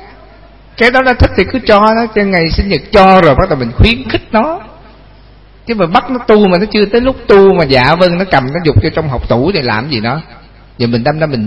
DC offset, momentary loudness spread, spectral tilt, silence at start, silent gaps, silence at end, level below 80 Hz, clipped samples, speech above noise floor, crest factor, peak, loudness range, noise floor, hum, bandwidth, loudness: under 0.1%; 9 LU; -7.5 dB/octave; 0 s; none; 0 s; -24 dBFS; 0.7%; 29 dB; 10 dB; 0 dBFS; 4 LU; -38 dBFS; none; 11 kHz; -10 LUFS